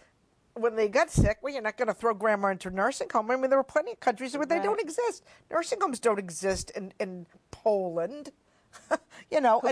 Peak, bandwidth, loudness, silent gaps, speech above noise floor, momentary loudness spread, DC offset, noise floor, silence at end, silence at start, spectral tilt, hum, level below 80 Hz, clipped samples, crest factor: -12 dBFS; 11 kHz; -29 LUFS; none; 39 dB; 11 LU; under 0.1%; -67 dBFS; 0 s; 0.55 s; -5 dB/octave; none; -46 dBFS; under 0.1%; 18 dB